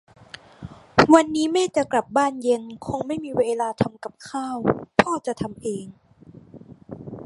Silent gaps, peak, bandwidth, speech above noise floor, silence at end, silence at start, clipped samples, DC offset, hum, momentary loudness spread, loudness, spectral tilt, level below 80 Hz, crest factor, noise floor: none; 0 dBFS; 11.5 kHz; 25 dB; 0 s; 0.6 s; under 0.1%; under 0.1%; none; 25 LU; -22 LUFS; -5 dB/octave; -54 dBFS; 24 dB; -48 dBFS